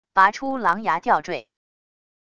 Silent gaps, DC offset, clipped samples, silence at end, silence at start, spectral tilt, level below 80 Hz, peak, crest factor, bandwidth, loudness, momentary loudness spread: none; under 0.1%; under 0.1%; 0.8 s; 0.15 s; -4.5 dB/octave; -62 dBFS; -2 dBFS; 20 dB; 10 kHz; -21 LUFS; 11 LU